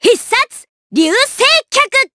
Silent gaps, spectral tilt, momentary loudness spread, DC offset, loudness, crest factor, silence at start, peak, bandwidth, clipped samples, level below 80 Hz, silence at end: 0.69-0.90 s; -1 dB/octave; 8 LU; under 0.1%; -11 LUFS; 12 dB; 0 s; 0 dBFS; 11 kHz; under 0.1%; -56 dBFS; 0.1 s